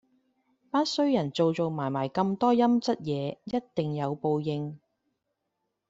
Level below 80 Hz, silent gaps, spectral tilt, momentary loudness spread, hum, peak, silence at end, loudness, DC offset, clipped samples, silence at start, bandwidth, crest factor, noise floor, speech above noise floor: -68 dBFS; none; -6.5 dB/octave; 9 LU; none; -12 dBFS; 1.1 s; -28 LUFS; under 0.1%; under 0.1%; 0.75 s; 7.8 kHz; 18 dB; -81 dBFS; 54 dB